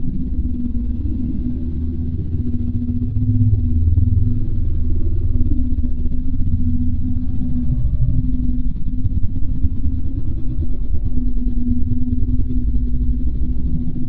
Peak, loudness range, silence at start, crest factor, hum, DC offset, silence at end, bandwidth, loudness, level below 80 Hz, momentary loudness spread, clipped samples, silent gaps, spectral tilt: -2 dBFS; 4 LU; 0 s; 14 dB; none; under 0.1%; 0 s; 0.8 kHz; -22 LUFS; -20 dBFS; 7 LU; under 0.1%; none; -13 dB/octave